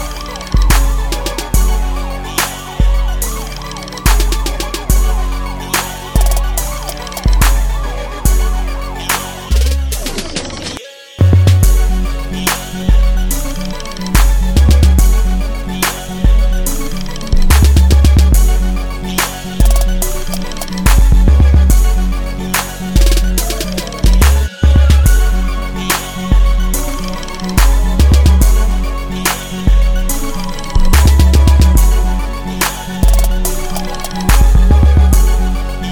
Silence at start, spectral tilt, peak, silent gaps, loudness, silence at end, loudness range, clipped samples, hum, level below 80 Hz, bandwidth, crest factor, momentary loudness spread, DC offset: 0 s; -4.5 dB/octave; 0 dBFS; none; -14 LUFS; 0 s; 4 LU; under 0.1%; none; -12 dBFS; 17.5 kHz; 10 dB; 12 LU; under 0.1%